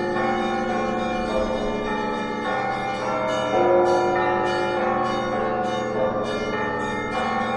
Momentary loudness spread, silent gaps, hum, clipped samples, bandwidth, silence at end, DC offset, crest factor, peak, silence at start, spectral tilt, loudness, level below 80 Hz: 6 LU; none; 50 Hz at -55 dBFS; under 0.1%; 11 kHz; 0 s; under 0.1%; 16 dB; -8 dBFS; 0 s; -5.5 dB/octave; -23 LUFS; -46 dBFS